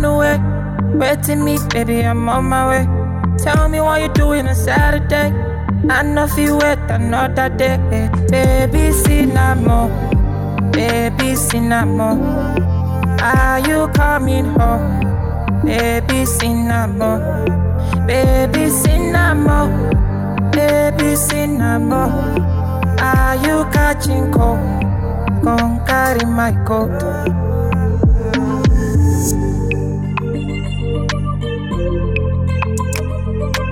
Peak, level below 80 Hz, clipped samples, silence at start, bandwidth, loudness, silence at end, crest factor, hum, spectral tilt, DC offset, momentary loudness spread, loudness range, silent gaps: -4 dBFS; -22 dBFS; under 0.1%; 0 s; 17 kHz; -15 LUFS; 0 s; 10 dB; none; -6 dB/octave; under 0.1%; 5 LU; 2 LU; none